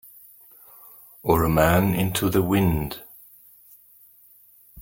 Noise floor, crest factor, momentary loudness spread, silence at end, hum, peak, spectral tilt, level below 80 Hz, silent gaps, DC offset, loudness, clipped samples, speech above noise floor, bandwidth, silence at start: -54 dBFS; 22 dB; 26 LU; 0 s; none; -2 dBFS; -6 dB/octave; -42 dBFS; none; under 0.1%; -22 LUFS; under 0.1%; 33 dB; 17 kHz; 1.25 s